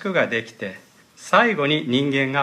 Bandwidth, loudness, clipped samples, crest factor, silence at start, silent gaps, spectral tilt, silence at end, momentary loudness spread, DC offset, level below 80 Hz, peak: 14 kHz; -20 LUFS; under 0.1%; 18 dB; 0 s; none; -5 dB/octave; 0 s; 16 LU; under 0.1%; -72 dBFS; -4 dBFS